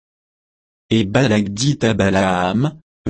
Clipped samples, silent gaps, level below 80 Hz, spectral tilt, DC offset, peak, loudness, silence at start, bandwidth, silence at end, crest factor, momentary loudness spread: under 0.1%; 2.82-3.05 s; -48 dBFS; -5.5 dB/octave; under 0.1%; -2 dBFS; -17 LUFS; 0.9 s; 8.8 kHz; 0 s; 16 dB; 5 LU